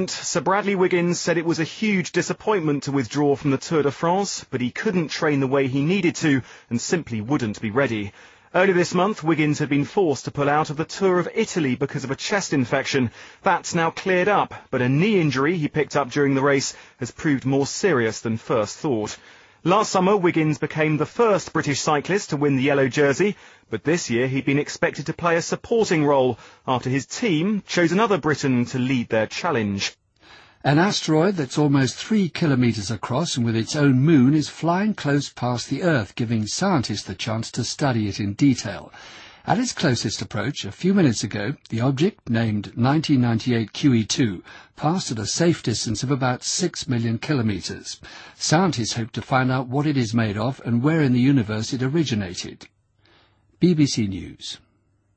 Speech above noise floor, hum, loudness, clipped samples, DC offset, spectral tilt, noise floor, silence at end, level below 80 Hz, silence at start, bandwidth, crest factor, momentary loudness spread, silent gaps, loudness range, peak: 37 dB; none; -22 LUFS; under 0.1%; under 0.1%; -5.5 dB/octave; -59 dBFS; 0.6 s; -56 dBFS; 0 s; 8.8 kHz; 18 dB; 8 LU; none; 3 LU; -4 dBFS